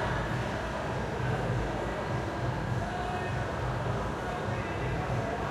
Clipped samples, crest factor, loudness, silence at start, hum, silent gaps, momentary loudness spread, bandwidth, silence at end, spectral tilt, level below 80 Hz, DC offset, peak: under 0.1%; 14 dB; -33 LUFS; 0 s; none; none; 2 LU; 13.5 kHz; 0 s; -6.5 dB/octave; -42 dBFS; under 0.1%; -18 dBFS